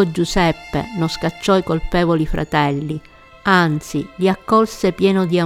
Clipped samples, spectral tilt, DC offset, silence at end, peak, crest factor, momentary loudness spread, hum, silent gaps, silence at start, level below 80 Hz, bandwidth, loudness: under 0.1%; -6 dB/octave; under 0.1%; 0 s; -2 dBFS; 16 dB; 9 LU; none; none; 0 s; -34 dBFS; 15.5 kHz; -18 LUFS